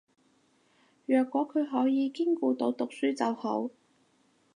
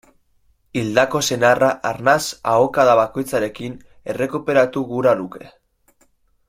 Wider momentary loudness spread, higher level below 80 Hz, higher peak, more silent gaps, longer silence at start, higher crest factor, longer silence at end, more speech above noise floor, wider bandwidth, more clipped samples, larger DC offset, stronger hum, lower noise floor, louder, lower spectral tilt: second, 6 LU vs 15 LU; second, -86 dBFS vs -54 dBFS; second, -14 dBFS vs -2 dBFS; neither; first, 1.1 s vs 0.75 s; about the same, 16 dB vs 18 dB; second, 0.85 s vs 1 s; about the same, 40 dB vs 42 dB; second, 10 kHz vs 16.5 kHz; neither; neither; neither; first, -68 dBFS vs -60 dBFS; second, -29 LUFS vs -18 LUFS; about the same, -5.5 dB/octave vs -4.5 dB/octave